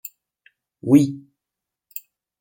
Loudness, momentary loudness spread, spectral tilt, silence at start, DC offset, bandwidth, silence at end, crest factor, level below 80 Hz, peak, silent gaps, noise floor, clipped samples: -18 LUFS; 23 LU; -7.5 dB/octave; 0.85 s; under 0.1%; 17 kHz; 1.2 s; 22 dB; -66 dBFS; -2 dBFS; none; -86 dBFS; under 0.1%